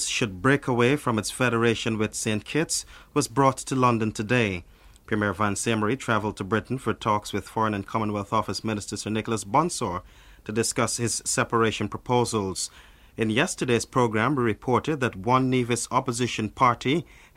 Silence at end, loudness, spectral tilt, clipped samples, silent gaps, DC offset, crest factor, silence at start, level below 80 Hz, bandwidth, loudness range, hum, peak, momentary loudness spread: 0.35 s; -25 LUFS; -4.5 dB/octave; under 0.1%; none; under 0.1%; 20 dB; 0 s; -52 dBFS; 16 kHz; 3 LU; none; -6 dBFS; 7 LU